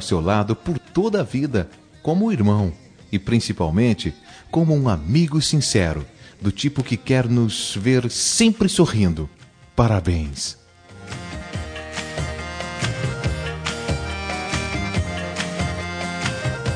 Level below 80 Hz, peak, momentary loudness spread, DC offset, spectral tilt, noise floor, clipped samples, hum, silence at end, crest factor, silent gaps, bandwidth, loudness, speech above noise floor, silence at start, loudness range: -38 dBFS; -2 dBFS; 12 LU; under 0.1%; -5 dB/octave; -42 dBFS; under 0.1%; none; 0 s; 20 dB; none; 10.5 kHz; -21 LUFS; 23 dB; 0 s; 7 LU